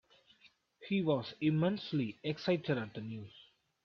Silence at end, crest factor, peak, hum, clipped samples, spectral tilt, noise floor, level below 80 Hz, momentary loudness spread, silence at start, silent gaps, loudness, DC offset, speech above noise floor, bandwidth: 0.45 s; 16 dB; -20 dBFS; none; under 0.1%; -8 dB/octave; -67 dBFS; -74 dBFS; 14 LU; 0.45 s; none; -35 LUFS; under 0.1%; 33 dB; 6.6 kHz